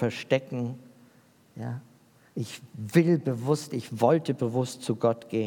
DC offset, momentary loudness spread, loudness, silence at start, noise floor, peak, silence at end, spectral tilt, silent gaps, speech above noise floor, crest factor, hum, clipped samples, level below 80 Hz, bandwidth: under 0.1%; 15 LU; -28 LUFS; 0 s; -59 dBFS; -8 dBFS; 0 s; -6.5 dB/octave; none; 32 dB; 20 dB; none; under 0.1%; -78 dBFS; 18 kHz